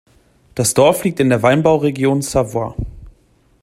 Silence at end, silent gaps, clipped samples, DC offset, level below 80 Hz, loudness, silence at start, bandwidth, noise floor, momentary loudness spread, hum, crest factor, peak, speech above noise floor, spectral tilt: 0.55 s; none; under 0.1%; under 0.1%; -38 dBFS; -15 LUFS; 0.55 s; 16 kHz; -54 dBFS; 14 LU; none; 16 dB; 0 dBFS; 40 dB; -5 dB/octave